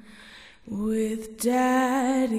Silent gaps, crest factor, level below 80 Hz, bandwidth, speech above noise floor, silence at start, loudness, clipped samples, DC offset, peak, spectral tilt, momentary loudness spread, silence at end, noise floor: none; 14 dB; -56 dBFS; 15.5 kHz; 24 dB; 0.05 s; -25 LUFS; under 0.1%; under 0.1%; -10 dBFS; -4.5 dB/octave; 11 LU; 0 s; -48 dBFS